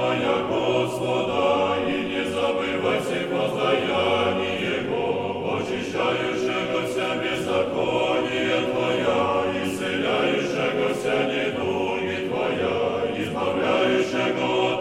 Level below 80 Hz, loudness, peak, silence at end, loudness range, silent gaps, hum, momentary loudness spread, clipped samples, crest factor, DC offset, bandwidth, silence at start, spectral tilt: -56 dBFS; -23 LUFS; -8 dBFS; 0 s; 1 LU; none; none; 4 LU; under 0.1%; 14 dB; under 0.1%; 15.5 kHz; 0 s; -5 dB/octave